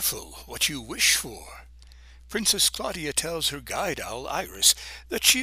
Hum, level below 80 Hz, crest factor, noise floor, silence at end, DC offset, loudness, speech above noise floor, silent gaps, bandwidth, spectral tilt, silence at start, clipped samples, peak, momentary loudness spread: none; -48 dBFS; 24 dB; -48 dBFS; 0 s; under 0.1%; -24 LUFS; 22 dB; none; 16 kHz; -0.5 dB/octave; 0 s; under 0.1%; -4 dBFS; 15 LU